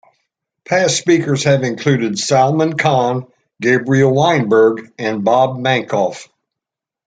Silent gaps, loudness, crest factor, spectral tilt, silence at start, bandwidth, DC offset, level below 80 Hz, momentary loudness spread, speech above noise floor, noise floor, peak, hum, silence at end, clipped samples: none; -15 LUFS; 14 dB; -5 dB/octave; 0.7 s; 9.4 kHz; under 0.1%; -58 dBFS; 7 LU; 70 dB; -84 dBFS; -2 dBFS; none; 0.85 s; under 0.1%